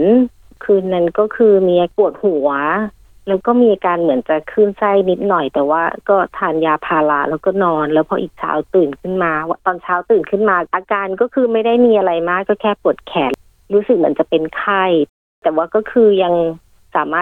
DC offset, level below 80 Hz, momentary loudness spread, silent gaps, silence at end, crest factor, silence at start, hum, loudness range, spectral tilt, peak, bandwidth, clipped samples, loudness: under 0.1%; -52 dBFS; 8 LU; 15.09-15.42 s; 0 s; 14 dB; 0 s; none; 2 LU; -8.5 dB/octave; -2 dBFS; 4.1 kHz; under 0.1%; -15 LUFS